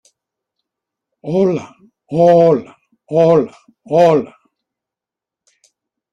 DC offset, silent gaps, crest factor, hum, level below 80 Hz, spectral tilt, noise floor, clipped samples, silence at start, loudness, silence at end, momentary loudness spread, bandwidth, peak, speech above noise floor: under 0.1%; none; 16 dB; none; -58 dBFS; -8 dB/octave; -86 dBFS; under 0.1%; 1.25 s; -14 LUFS; 1.85 s; 14 LU; 7.6 kHz; -2 dBFS; 74 dB